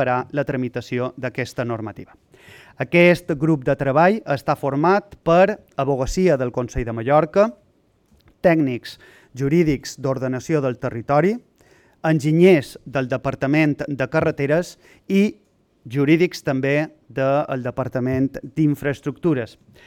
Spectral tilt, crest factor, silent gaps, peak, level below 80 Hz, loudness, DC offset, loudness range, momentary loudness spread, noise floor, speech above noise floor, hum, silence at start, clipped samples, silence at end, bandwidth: -7 dB/octave; 18 dB; none; -2 dBFS; -44 dBFS; -20 LUFS; under 0.1%; 3 LU; 10 LU; -60 dBFS; 41 dB; none; 0 s; under 0.1%; 0.4 s; 17 kHz